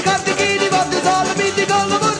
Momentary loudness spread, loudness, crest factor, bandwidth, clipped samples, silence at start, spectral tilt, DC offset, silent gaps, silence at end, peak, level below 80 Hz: 2 LU; -16 LUFS; 12 dB; 10.5 kHz; under 0.1%; 0 s; -3 dB/octave; under 0.1%; none; 0 s; -4 dBFS; -50 dBFS